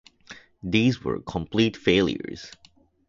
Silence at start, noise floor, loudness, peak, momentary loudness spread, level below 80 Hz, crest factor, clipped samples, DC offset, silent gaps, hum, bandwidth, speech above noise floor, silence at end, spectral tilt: 0.3 s; -48 dBFS; -24 LUFS; -6 dBFS; 23 LU; -50 dBFS; 20 dB; under 0.1%; under 0.1%; none; none; 7.6 kHz; 24 dB; 0.6 s; -6 dB/octave